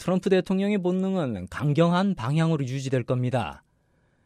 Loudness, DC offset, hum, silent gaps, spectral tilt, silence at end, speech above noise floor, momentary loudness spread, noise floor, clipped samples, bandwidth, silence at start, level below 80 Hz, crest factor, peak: -25 LUFS; under 0.1%; none; none; -7.5 dB/octave; 0.7 s; 42 dB; 7 LU; -66 dBFS; under 0.1%; 11.5 kHz; 0 s; -56 dBFS; 16 dB; -10 dBFS